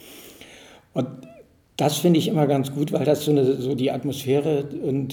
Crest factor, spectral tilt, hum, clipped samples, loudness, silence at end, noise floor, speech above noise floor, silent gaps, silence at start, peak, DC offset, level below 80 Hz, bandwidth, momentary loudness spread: 18 dB; -6.5 dB/octave; none; under 0.1%; -22 LUFS; 0 s; -50 dBFS; 29 dB; none; 0.05 s; -6 dBFS; under 0.1%; -62 dBFS; 19 kHz; 18 LU